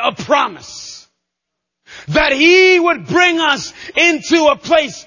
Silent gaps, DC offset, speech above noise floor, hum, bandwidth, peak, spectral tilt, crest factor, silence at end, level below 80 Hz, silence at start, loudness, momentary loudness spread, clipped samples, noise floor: none; under 0.1%; 65 dB; none; 7.4 kHz; 0 dBFS; -3.5 dB/octave; 14 dB; 0.05 s; -44 dBFS; 0 s; -12 LUFS; 15 LU; under 0.1%; -78 dBFS